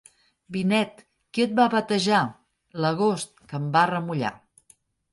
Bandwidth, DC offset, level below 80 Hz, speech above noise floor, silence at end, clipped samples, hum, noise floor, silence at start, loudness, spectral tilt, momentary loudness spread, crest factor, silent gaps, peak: 11.5 kHz; under 0.1%; -66 dBFS; 38 dB; 0.75 s; under 0.1%; none; -61 dBFS; 0.5 s; -24 LUFS; -5.5 dB/octave; 11 LU; 18 dB; none; -8 dBFS